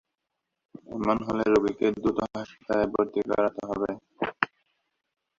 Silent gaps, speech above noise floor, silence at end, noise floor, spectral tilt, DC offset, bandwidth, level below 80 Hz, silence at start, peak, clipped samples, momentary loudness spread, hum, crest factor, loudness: none; 57 dB; 0.95 s; -83 dBFS; -6.5 dB/octave; under 0.1%; 7.4 kHz; -56 dBFS; 0.9 s; -2 dBFS; under 0.1%; 10 LU; none; 26 dB; -27 LUFS